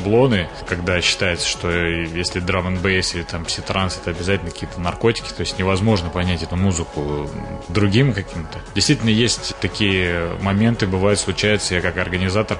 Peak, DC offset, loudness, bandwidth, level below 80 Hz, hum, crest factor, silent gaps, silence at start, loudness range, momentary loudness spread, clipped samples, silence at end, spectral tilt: -2 dBFS; under 0.1%; -19 LUFS; 11 kHz; -38 dBFS; none; 16 dB; none; 0 s; 3 LU; 8 LU; under 0.1%; 0 s; -4.5 dB/octave